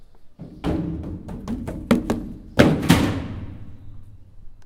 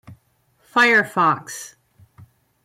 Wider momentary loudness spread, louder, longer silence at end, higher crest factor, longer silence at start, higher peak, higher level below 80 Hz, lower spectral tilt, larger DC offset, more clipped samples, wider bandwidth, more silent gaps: about the same, 22 LU vs 20 LU; second, -23 LUFS vs -17 LUFS; second, 0 s vs 0.95 s; first, 24 dB vs 16 dB; about the same, 0 s vs 0.1 s; first, 0 dBFS vs -6 dBFS; first, -38 dBFS vs -68 dBFS; first, -6 dB/octave vs -3.5 dB/octave; neither; neither; about the same, 17 kHz vs 16.5 kHz; neither